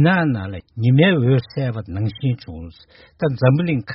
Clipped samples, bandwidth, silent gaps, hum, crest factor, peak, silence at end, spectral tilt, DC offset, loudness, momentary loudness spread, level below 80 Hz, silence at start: under 0.1%; 5.8 kHz; none; none; 16 dB; -2 dBFS; 0 s; -6.5 dB/octave; under 0.1%; -19 LUFS; 15 LU; -48 dBFS; 0 s